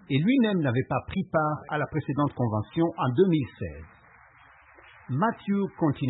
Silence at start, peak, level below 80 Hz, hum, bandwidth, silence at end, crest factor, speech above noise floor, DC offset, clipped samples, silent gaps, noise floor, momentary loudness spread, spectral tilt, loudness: 0.1 s; -10 dBFS; -56 dBFS; none; 4.1 kHz; 0 s; 18 dB; 29 dB; under 0.1%; under 0.1%; none; -55 dBFS; 9 LU; -12 dB/octave; -27 LUFS